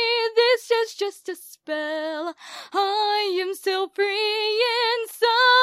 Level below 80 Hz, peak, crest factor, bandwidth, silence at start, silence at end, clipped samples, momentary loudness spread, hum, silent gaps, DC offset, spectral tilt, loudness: -86 dBFS; -6 dBFS; 16 dB; 15.5 kHz; 0 s; 0 s; under 0.1%; 12 LU; none; none; under 0.1%; 1 dB/octave; -22 LUFS